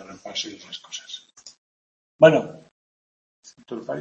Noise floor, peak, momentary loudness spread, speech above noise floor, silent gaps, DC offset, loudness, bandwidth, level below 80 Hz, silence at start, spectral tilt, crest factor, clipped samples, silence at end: under -90 dBFS; 0 dBFS; 22 LU; over 69 dB; 1.58-2.19 s, 2.71-3.43 s; under 0.1%; -20 LUFS; 7.6 kHz; -68 dBFS; 0 s; -4.5 dB/octave; 24 dB; under 0.1%; 0 s